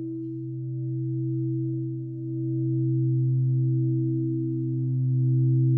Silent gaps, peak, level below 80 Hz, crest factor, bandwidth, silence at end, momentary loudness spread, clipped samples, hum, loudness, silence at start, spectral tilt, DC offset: none; -14 dBFS; -78 dBFS; 10 dB; 0.6 kHz; 0 s; 9 LU; under 0.1%; none; -27 LUFS; 0 s; -16 dB/octave; under 0.1%